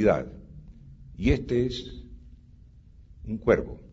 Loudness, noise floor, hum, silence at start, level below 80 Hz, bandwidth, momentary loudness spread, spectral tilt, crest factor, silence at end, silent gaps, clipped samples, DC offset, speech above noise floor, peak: -27 LUFS; -52 dBFS; none; 0 s; -40 dBFS; 7.8 kHz; 24 LU; -7.5 dB/octave; 22 dB; 0.05 s; none; under 0.1%; under 0.1%; 26 dB; -6 dBFS